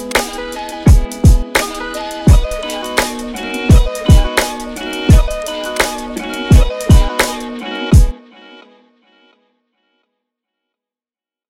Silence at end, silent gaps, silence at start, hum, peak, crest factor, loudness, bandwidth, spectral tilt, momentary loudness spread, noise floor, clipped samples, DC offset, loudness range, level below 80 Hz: 2.95 s; none; 0 s; none; 0 dBFS; 14 dB; -14 LUFS; 16.5 kHz; -5.5 dB/octave; 11 LU; under -90 dBFS; under 0.1%; under 0.1%; 6 LU; -16 dBFS